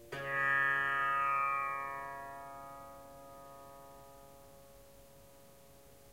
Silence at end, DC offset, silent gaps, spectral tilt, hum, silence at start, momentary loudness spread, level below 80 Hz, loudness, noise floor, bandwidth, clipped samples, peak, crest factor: 0 s; under 0.1%; none; -3.5 dB/octave; none; 0 s; 25 LU; -68 dBFS; -33 LUFS; -60 dBFS; 16 kHz; under 0.1%; -22 dBFS; 18 dB